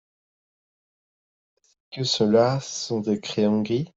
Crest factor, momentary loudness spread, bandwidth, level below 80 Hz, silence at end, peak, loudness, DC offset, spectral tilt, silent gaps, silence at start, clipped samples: 18 dB; 9 LU; 7.8 kHz; -64 dBFS; 0.1 s; -8 dBFS; -23 LUFS; under 0.1%; -5.5 dB/octave; none; 1.9 s; under 0.1%